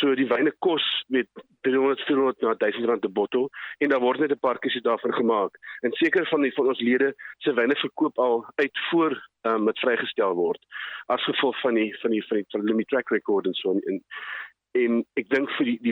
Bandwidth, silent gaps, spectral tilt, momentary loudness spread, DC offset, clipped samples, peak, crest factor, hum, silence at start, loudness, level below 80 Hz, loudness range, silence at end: 5.8 kHz; none; -7 dB/octave; 7 LU; under 0.1%; under 0.1%; -10 dBFS; 16 dB; none; 0 s; -25 LUFS; -78 dBFS; 2 LU; 0 s